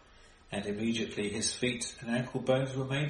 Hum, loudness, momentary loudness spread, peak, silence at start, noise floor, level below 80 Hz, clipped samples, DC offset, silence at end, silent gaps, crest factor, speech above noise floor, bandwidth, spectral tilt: none; -33 LUFS; 6 LU; -14 dBFS; 0.2 s; -58 dBFS; -60 dBFS; under 0.1%; under 0.1%; 0 s; none; 18 dB; 25 dB; 11.5 kHz; -4.5 dB/octave